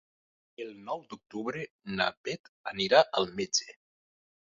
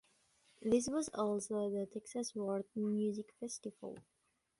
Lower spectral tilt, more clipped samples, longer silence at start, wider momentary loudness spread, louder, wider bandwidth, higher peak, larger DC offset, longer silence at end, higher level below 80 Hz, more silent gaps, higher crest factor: second, -1.5 dB/octave vs -5.5 dB/octave; neither; about the same, 0.6 s vs 0.6 s; first, 19 LU vs 12 LU; first, -30 LUFS vs -39 LUFS; second, 7.6 kHz vs 11.5 kHz; first, -8 dBFS vs -20 dBFS; neither; first, 0.9 s vs 0.6 s; first, -70 dBFS vs -76 dBFS; first, 1.70-1.79 s, 2.17-2.24 s, 2.39-2.64 s vs none; first, 26 dB vs 20 dB